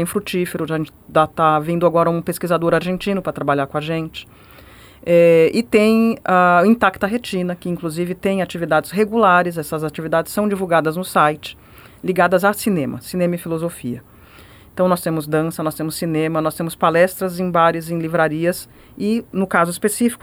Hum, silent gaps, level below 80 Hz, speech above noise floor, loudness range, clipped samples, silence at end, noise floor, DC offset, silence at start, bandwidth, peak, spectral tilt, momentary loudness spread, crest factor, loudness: none; none; -50 dBFS; 26 dB; 6 LU; under 0.1%; 0.05 s; -44 dBFS; under 0.1%; 0 s; over 20 kHz; -2 dBFS; -6 dB/octave; 11 LU; 16 dB; -18 LUFS